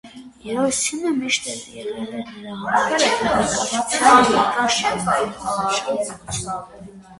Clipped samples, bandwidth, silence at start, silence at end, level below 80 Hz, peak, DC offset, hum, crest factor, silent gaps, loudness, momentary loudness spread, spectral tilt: under 0.1%; 11.5 kHz; 0.05 s; 0.05 s; -50 dBFS; 0 dBFS; under 0.1%; none; 20 dB; none; -19 LUFS; 16 LU; -2.5 dB/octave